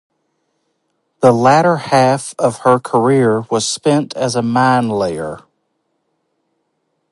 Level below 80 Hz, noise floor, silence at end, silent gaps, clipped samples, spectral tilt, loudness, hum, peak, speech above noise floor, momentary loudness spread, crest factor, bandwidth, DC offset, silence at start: -56 dBFS; -68 dBFS; 1.75 s; none; under 0.1%; -5.5 dB/octave; -14 LUFS; none; 0 dBFS; 55 dB; 8 LU; 16 dB; 11.5 kHz; under 0.1%; 1.2 s